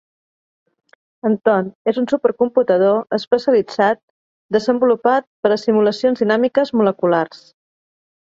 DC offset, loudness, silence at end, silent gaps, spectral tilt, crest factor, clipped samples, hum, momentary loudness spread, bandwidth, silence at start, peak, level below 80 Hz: under 0.1%; -17 LUFS; 0.95 s; 1.75-1.85 s, 3.27-3.31 s, 4.03-4.49 s, 5.27-5.43 s; -6.5 dB/octave; 16 dB; under 0.1%; none; 5 LU; 7.6 kHz; 1.25 s; -2 dBFS; -64 dBFS